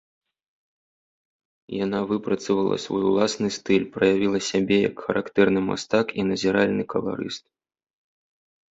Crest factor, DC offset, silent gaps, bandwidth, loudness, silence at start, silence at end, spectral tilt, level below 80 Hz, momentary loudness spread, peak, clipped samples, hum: 20 dB; under 0.1%; none; 8 kHz; -23 LUFS; 1.7 s; 1.35 s; -5 dB/octave; -58 dBFS; 7 LU; -4 dBFS; under 0.1%; none